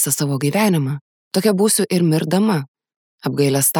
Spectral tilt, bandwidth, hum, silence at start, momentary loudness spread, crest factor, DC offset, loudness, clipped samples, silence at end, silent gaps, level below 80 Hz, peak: -5 dB/octave; over 20 kHz; none; 0 s; 10 LU; 14 dB; under 0.1%; -18 LUFS; under 0.1%; 0 s; 1.01-1.31 s, 2.68-2.74 s, 2.96-3.18 s; -68 dBFS; -2 dBFS